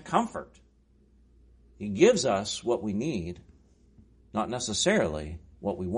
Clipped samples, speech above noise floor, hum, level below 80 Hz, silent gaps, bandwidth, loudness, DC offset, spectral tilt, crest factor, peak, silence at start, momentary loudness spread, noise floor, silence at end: under 0.1%; 34 dB; none; -52 dBFS; none; 10.5 kHz; -28 LUFS; under 0.1%; -4 dB/octave; 22 dB; -8 dBFS; 0 s; 18 LU; -62 dBFS; 0 s